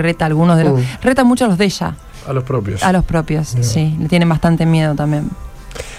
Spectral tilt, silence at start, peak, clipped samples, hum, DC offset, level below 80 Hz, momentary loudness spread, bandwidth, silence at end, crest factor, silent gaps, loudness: -6.5 dB/octave; 0 s; -2 dBFS; under 0.1%; none; under 0.1%; -32 dBFS; 11 LU; 14 kHz; 0 s; 14 dB; none; -15 LUFS